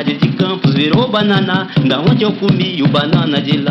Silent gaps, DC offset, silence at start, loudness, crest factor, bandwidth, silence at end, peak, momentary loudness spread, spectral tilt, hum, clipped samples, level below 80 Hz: none; under 0.1%; 0 s; -13 LUFS; 10 dB; 6 kHz; 0 s; -2 dBFS; 2 LU; -8 dB/octave; none; under 0.1%; -46 dBFS